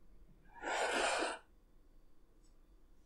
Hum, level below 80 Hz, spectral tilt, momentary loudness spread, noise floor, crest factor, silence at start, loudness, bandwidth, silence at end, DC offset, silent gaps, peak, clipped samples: none; -64 dBFS; -1 dB/octave; 13 LU; -64 dBFS; 20 dB; 0 s; -37 LUFS; 15.5 kHz; 0.2 s; under 0.1%; none; -22 dBFS; under 0.1%